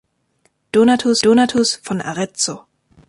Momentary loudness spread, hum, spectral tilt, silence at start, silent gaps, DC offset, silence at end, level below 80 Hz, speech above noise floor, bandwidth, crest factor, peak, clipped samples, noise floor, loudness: 10 LU; none; -3.5 dB/octave; 0.75 s; none; under 0.1%; 0.5 s; -58 dBFS; 48 dB; 11.5 kHz; 14 dB; -4 dBFS; under 0.1%; -63 dBFS; -16 LUFS